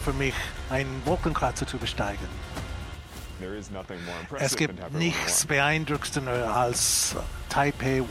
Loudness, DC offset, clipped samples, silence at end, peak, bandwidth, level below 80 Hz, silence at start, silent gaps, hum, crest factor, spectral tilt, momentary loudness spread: -27 LUFS; under 0.1%; under 0.1%; 0 s; -8 dBFS; 16 kHz; -40 dBFS; 0 s; none; none; 20 dB; -3.5 dB/octave; 15 LU